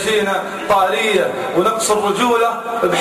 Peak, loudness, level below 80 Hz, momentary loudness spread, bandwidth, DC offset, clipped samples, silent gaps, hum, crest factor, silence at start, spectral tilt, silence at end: -4 dBFS; -16 LUFS; -52 dBFS; 4 LU; 15 kHz; under 0.1%; under 0.1%; none; none; 12 dB; 0 s; -3 dB/octave; 0 s